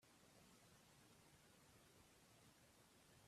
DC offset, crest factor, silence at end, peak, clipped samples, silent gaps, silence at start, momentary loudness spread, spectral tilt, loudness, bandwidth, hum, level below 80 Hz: under 0.1%; 16 dB; 0 s; -56 dBFS; under 0.1%; none; 0 s; 1 LU; -3.5 dB/octave; -70 LUFS; 14 kHz; none; -86 dBFS